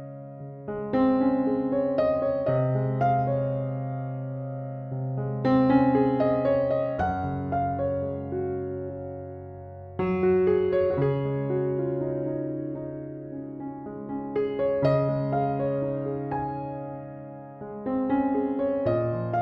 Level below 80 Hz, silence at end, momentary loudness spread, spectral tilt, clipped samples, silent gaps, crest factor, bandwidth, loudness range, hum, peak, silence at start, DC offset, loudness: -54 dBFS; 0 s; 15 LU; -11 dB/octave; under 0.1%; none; 16 dB; 5.4 kHz; 5 LU; none; -10 dBFS; 0 s; under 0.1%; -27 LUFS